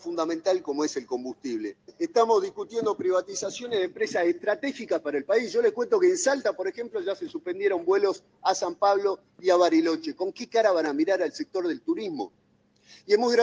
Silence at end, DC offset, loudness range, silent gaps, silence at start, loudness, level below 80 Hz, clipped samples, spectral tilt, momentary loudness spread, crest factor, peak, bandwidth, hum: 0 s; under 0.1%; 3 LU; none; 0.05 s; -26 LUFS; -76 dBFS; under 0.1%; -3.5 dB/octave; 10 LU; 18 dB; -8 dBFS; 9.8 kHz; none